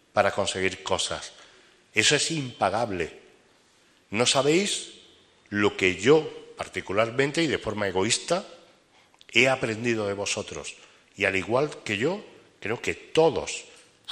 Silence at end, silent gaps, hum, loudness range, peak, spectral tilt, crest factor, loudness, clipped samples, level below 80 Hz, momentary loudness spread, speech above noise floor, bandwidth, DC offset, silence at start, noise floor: 0 s; none; none; 3 LU; -2 dBFS; -3 dB/octave; 24 dB; -25 LUFS; under 0.1%; -60 dBFS; 15 LU; 36 dB; 15 kHz; under 0.1%; 0.15 s; -61 dBFS